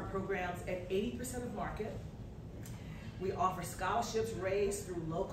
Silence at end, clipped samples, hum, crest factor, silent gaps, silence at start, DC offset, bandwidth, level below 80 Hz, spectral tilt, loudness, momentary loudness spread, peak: 0 s; under 0.1%; none; 18 dB; none; 0 s; under 0.1%; 16 kHz; -52 dBFS; -5 dB/octave; -38 LUFS; 12 LU; -20 dBFS